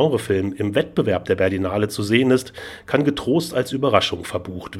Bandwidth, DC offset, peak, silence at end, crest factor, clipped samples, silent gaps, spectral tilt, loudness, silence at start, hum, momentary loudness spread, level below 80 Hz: 16 kHz; under 0.1%; 0 dBFS; 0 s; 20 dB; under 0.1%; none; -5.5 dB/octave; -20 LUFS; 0 s; none; 8 LU; -50 dBFS